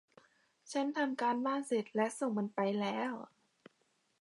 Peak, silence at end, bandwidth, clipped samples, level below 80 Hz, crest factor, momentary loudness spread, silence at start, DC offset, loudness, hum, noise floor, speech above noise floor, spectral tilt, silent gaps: -20 dBFS; 0.95 s; 11.5 kHz; under 0.1%; under -90 dBFS; 18 dB; 7 LU; 0.65 s; under 0.1%; -36 LUFS; none; -77 dBFS; 42 dB; -5 dB/octave; none